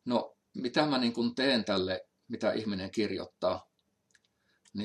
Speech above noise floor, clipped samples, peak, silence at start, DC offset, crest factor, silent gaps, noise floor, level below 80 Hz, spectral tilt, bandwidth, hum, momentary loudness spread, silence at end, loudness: 42 dB; under 0.1%; -12 dBFS; 0.05 s; under 0.1%; 20 dB; none; -72 dBFS; -76 dBFS; -5.5 dB/octave; 11 kHz; none; 11 LU; 0 s; -32 LUFS